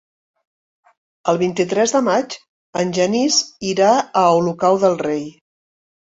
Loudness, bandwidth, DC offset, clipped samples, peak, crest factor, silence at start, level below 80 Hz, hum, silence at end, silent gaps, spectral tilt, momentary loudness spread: -17 LUFS; 8.2 kHz; under 0.1%; under 0.1%; -2 dBFS; 16 dB; 1.25 s; -62 dBFS; none; 0.85 s; 2.49-2.73 s; -4 dB/octave; 11 LU